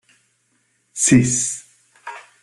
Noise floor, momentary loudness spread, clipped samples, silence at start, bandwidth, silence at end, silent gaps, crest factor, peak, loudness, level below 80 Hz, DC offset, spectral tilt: -65 dBFS; 22 LU; under 0.1%; 0.95 s; 12.5 kHz; 0.2 s; none; 20 dB; -2 dBFS; -16 LUFS; -52 dBFS; under 0.1%; -4 dB/octave